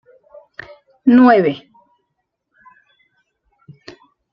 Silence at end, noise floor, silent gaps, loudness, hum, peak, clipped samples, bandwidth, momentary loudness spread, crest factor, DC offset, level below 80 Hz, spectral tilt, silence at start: 2.75 s; -73 dBFS; none; -12 LUFS; none; -2 dBFS; under 0.1%; 5.4 kHz; 27 LU; 18 dB; under 0.1%; -62 dBFS; -8.5 dB/octave; 1.05 s